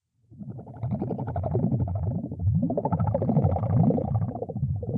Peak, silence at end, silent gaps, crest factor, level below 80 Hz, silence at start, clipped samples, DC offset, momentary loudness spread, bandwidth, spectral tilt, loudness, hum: -10 dBFS; 0 s; none; 16 dB; -44 dBFS; 0.3 s; under 0.1%; under 0.1%; 11 LU; 2.5 kHz; -14 dB/octave; -27 LUFS; none